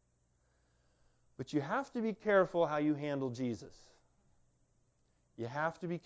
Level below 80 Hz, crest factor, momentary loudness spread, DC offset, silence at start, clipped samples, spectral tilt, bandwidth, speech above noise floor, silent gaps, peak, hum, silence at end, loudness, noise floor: -74 dBFS; 20 dB; 12 LU; under 0.1%; 1.4 s; under 0.1%; -7 dB/octave; 8 kHz; 40 dB; none; -18 dBFS; none; 0.05 s; -35 LUFS; -75 dBFS